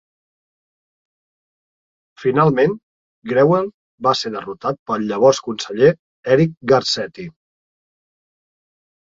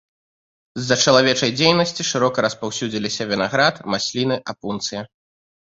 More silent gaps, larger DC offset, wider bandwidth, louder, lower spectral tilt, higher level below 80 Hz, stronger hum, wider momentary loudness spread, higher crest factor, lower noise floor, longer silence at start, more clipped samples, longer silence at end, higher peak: first, 2.83-3.22 s, 3.74-3.98 s, 4.79-4.86 s, 5.99-6.23 s vs none; neither; about the same, 7.8 kHz vs 8 kHz; about the same, -18 LUFS vs -19 LUFS; first, -5.5 dB/octave vs -3.5 dB/octave; about the same, -58 dBFS vs -58 dBFS; neither; about the same, 14 LU vs 13 LU; about the same, 18 dB vs 20 dB; about the same, under -90 dBFS vs under -90 dBFS; first, 2.2 s vs 0.75 s; neither; first, 1.7 s vs 0.7 s; about the same, -2 dBFS vs 0 dBFS